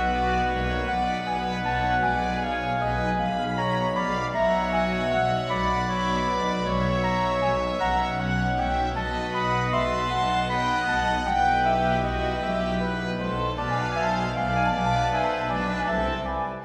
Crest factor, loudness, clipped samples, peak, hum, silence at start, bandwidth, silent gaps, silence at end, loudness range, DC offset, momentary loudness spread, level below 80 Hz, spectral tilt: 14 dB; -25 LUFS; under 0.1%; -10 dBFS; none; 0 s; 11 kHz; none; 0 s; 2 LU; under 0.1%; 4 LU; -38 dBFS; -6 dB/octave